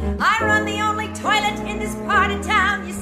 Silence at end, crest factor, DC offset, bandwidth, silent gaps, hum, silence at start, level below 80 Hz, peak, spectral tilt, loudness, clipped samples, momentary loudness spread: 0 s; 16 dB; under 0.1%; 15.5 kHz; none; none; 0 s; -36 dBFS; -4 dBFS; -4 dB/octave; -19 LUFS; under 0.1%; 7 LU